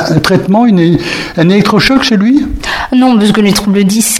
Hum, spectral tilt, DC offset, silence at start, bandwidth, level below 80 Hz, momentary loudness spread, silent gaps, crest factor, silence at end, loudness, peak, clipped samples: none; -5 dB/octave; under 0.1%; 0 s; 15.5 kHz; -30 dBFS; 5 LU; none; 8 dB; 0 s; -8 LUFS; 0 dBFS; 0.4%